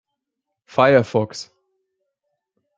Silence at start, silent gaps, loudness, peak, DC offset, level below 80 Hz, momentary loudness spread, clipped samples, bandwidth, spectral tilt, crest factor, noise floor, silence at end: 0.75 s; none; -18 LUFS; -2 dBFS; under 0.1%; -64 dBFS; 15 LU; under 0.1%; 8.6 kHz; -6 dB/octave; 20 dB; -81 dBFS; 1.35 s